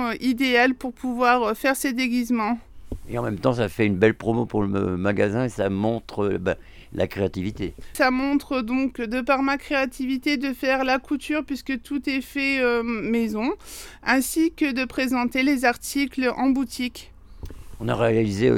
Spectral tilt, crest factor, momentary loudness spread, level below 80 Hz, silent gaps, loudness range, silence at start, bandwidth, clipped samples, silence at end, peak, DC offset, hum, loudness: -5.5 dB/octave; 20 dB; 10 LU; -46 dBFS; none; 2 LU; 0 s; 17 kHz; under 0.1%; 0 s; -4 dBFS; under 0.1%; none; -23 LUFS